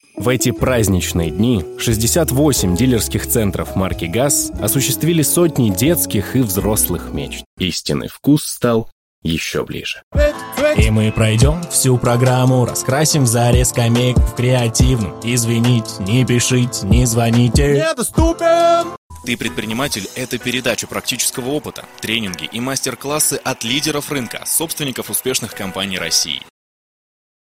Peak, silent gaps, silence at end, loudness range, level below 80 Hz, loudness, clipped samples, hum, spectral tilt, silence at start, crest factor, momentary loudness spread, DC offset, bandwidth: -2 dBFS; 7.46-7.57 s, 8.92-9.22 s, 10.03-10.11 s, 18.98-19.10 s; 1.1 s; 5 LU; -28 dBFS; -16 LUFS; under 0.1%; none; -4.5 dB/octave; 0.15 s; 14 dB; 8 LU; under 0.1%; 17 kHz